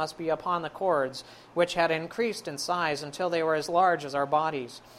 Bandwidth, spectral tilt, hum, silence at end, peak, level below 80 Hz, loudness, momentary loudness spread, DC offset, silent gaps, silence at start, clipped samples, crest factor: 15.5 kHz; -4 dB/octave; none; 0 s; -10 dBFS; -66 dBFS; -28 LUFS; 8 LU; under 0.1%; none; 0 s; under 0.1%; 18 dB